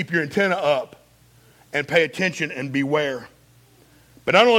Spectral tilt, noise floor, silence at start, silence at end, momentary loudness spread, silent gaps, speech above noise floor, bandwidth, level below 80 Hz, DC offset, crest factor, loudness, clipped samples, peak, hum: -4.5 dB/octave; -54 dBFS; 0 s; 0 s; 9 LU; none; 34 dB; 16.5 kHz; -62 dBFS; under 0.1%; 20 dB; -22 LUFS; under 0.1%; -2 dBFS; none